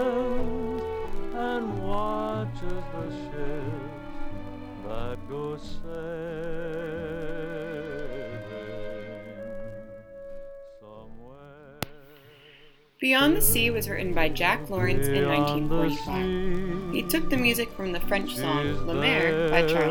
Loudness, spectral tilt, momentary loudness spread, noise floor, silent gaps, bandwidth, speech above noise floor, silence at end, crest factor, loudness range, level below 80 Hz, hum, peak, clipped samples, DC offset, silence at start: -28 LUFS; -4.5 dB/octave; 18 LU; -54 dBFS; none; 19.5 kHz; 30 dB; 0 s; 22 dB; 16 LU; -38 dBFS; none; -6 dBFS; under 0.1%; under 0.1%; 0 s